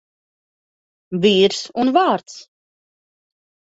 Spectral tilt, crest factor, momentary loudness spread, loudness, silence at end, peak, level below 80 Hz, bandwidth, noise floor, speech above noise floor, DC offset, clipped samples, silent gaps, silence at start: -5 dB/octave; 18 dB; 9 LU; -17 LUFS; 1.2 s; -2 dBFS; -64 dBFS; 8 kHz; under -90 dBFS; over 73 dB; under 0.1%; under 0.1%; none; 1.1 s